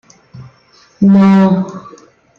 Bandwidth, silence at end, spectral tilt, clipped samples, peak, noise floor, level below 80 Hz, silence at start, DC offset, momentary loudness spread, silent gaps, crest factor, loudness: 6.8 kHz; 0.6 s; -9 dB/octave; under 0.1%; -2 dBFS; -48 dBFS; -52 dBFS; 0.35 s; under 0.1%; 17 LU; none; 12 dB; -10 LUFS